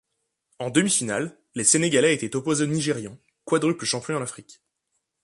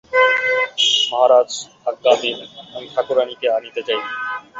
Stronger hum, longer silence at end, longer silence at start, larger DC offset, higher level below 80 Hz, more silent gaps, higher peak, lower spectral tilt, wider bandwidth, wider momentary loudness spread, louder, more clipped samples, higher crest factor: neither; first, 0.7 s vs 0 s; first, 0.6 s vs 0.1 s; neither; about the same, -64 dBFS vs -66 dBFS; neither; about the same, -2 dBFS vs -2 dBFS; first, -3.5 dB/octave vs -0.5 dB/octave; first, 11.5 kHz vs 8 kHz; about the same, 14 LU vs 12 LU; second, -23 LUFS vs -17 LUFS; neither; first, 22 dB vs 16 dB